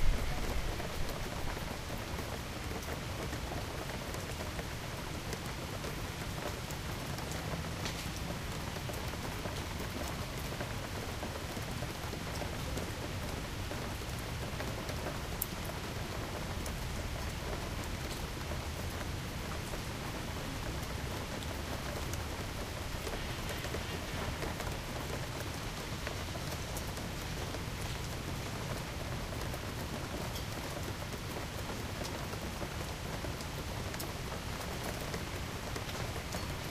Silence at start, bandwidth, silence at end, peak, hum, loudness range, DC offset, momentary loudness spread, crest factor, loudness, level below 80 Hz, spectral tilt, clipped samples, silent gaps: 0 s; 15.5 kHz; 0 s; -14 dBFS; none; 1 LU; under 0.1%; 2 LU; 24 dB; -39 LUFS; -44 dBFS; -4.5 dB/octave; under 0.1%; none